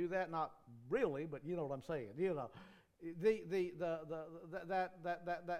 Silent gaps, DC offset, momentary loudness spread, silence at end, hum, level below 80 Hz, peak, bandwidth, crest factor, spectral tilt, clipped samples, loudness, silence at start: none; under 0.1%; 11 LU; 0 s; none; -72 dBFS; -24 dBFS; 14 kHz; 18 dB; -7 dB/octave; under 0.1%; -42 LUFS; 0 s